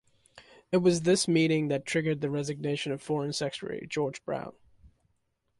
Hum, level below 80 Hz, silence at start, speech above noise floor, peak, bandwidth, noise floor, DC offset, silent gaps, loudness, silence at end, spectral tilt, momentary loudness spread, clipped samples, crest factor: none; -66 dBFS; 0.35 s; 47 dB; -14 dBFS; 11.5 kHz; -75 dBFS; under 0.1%; none; -29 LUFS; 0.75 s; -5 dB/octave; 11 LU; under 0.1%; 16 dB